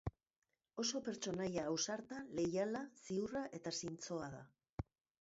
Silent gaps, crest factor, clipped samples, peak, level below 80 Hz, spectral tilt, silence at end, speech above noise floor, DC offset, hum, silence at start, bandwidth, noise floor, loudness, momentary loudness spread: 0.38-0.42 s, 4.72-4.77 s; 18 dB; under 0.1%; -26 dBFS; -64 dBFS; -4.5 dB/octave; 0.4 s; 47 dB; under 0.1%; none; 0.05 s; 7.6 kHz; -90 dBFS; -43 LUFS; 12 LU